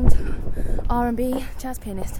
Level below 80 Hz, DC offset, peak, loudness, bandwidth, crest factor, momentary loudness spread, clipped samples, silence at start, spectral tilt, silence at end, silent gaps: -22 dBFS; under 0.1%; 0 dBFS; -27 LUFS; 14 kHz; 18 dB; 9 LU; under 0.1%; 0 s; -7 dB/octave; 0 s; none